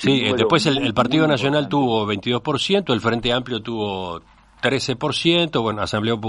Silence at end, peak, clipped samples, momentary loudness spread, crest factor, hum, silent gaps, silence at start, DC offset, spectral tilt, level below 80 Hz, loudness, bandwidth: 0 s; -2 dBFS; under 0.1%; 8 LU; 18 dB; none; none; 0 s; under 0.1%; -5 dB/octave; -48 dBFS; -20 LUFS; 11 kHz